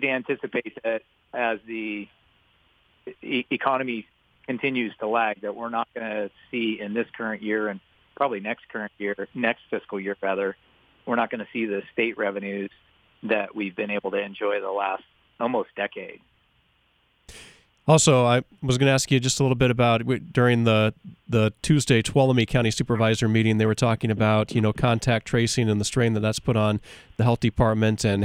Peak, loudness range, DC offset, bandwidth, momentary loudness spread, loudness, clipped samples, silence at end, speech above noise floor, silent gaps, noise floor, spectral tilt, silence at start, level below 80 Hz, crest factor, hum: -2 dBFS; 8 LU; under 0.1%; 14.5 kHz; 11 LU; -24 LUFS; under 0.1%; 0 s; 42 dB; none; -65 dBFS; -5.5 dB/octave; 0 s; -50 dBFS; 22 dB; none